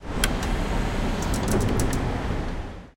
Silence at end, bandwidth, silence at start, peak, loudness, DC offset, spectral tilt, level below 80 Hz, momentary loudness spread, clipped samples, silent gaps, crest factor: 0.05 s; 17 kHz; 0 s; -2 dBFS; -27 LUFS; under 0.1%; -5 dB/octave; -28 dBFS; 6 LU; under 0.1%; none; 22 dB